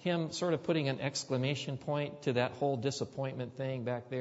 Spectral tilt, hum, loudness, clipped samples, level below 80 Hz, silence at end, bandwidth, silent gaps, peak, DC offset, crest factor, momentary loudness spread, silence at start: -5.5 dB/octave; none; -35 LUFS; under 0.1%; -72 dBFS; 0 s; 8 kHz; none; -18 dBFS; under 0.1%; 18 dB; 6 LU; 0 s